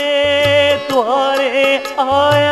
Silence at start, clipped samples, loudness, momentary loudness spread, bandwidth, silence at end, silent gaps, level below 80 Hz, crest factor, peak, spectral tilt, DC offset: 0 s; under 0.1%; -13 LUFS; 4 LU; 13 kHz; 0 s; none; -48 dBFS; 12 dB; -2 dBFS; -4 dB/octave; under 0.1%